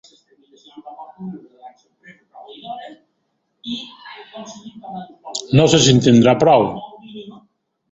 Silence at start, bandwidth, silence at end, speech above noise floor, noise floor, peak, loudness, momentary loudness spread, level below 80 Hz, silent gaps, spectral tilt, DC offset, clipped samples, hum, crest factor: 0.75 s; 8 kHz; 0.6 s; 56 dB; -70 dBFS; 0 dBFS; -14 LUFS; 26 LU; -52 dBFS; none; -5 dB/octave; under 0.1%; under 0.1%; none; 18 dB